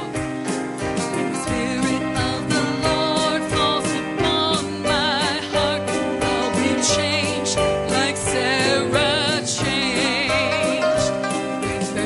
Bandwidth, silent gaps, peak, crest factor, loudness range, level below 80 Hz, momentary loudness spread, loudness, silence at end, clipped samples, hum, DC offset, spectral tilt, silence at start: 11.5 kHz; none; -6 dBFS; 16 dB; 2 LU; -44 dBFS; 6 LU; -20 LUFS; 0 s; under 0.1%; none; under 0.1%; -3.5 dB/octave; 0 s